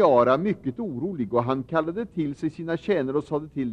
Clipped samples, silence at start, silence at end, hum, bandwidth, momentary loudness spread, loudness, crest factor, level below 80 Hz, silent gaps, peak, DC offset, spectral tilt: under 0.1%; 0 s; 0 s; none; 9.2 kHz; 9 LU; -26 LUFS; 18 dB; -58 dBFS; none; -8 dBFS; under 0.1%; -8.5 dB/octave